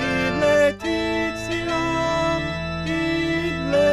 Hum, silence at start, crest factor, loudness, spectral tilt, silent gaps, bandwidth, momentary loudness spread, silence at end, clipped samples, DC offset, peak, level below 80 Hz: none; 0 s; 14 dB; -22 LUFS; -5 dB/octave; none; 14.5 kHz; 6 LU; 0 s; under 0.1%; 0.2%; -8 dBFS; -40 dBFS